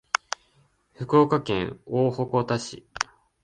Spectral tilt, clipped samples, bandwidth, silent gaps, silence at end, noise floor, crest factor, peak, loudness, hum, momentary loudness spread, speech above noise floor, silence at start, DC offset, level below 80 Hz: -5.5 dB/octave; under 0.1%; 10 kHz; none; 0.4 s; -64 dBFS; 22 dB; -4 dBFS; -25 LUFS; none; 15 LU; 40 dB; 1 s; under 0.1%; -56 dBFS